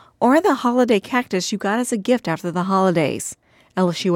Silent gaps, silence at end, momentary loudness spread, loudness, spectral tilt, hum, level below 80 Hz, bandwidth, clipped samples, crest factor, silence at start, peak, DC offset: none; 0 s; 7 LU; -19 LUFS; -5 dB/octave; none; -62 dBFS; 17 kHz; under 0.1%; 14 dB; 0.2 s; -4 dBFS; under 0.1%